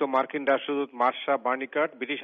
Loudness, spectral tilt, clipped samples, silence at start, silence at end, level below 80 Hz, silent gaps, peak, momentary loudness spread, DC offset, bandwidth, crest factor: -27 LUFS; -1 dB/octave; under 0.1%; 0 s; 0 s; -80 dBFS; none; -10 dBFS; 3 LU; under 0.1%; 5.8 kHz; 16 dB